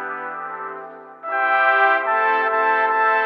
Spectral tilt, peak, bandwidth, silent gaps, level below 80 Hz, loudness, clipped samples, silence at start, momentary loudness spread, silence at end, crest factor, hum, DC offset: -4.5 dB/octave; -4 dBFS; 5.8 kHz; none; under -90 dBFS; -18 LUFS; under 0.1%; 0 s; 17 LU; 0 s; 16 dB; none; under 0.1%